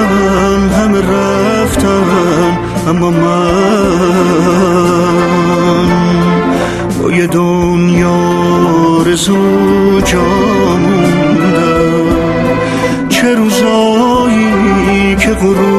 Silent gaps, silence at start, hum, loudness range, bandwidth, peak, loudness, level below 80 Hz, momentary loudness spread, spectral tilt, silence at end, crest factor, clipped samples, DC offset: none; 0 s; none; 1 LU; 13.5 kHz; 0 dBFS; -10 LUFS; -28 dBFS; 3 LU; -6 dB/octave; 0 s; 10 dB; under 0.1%; under 0.1%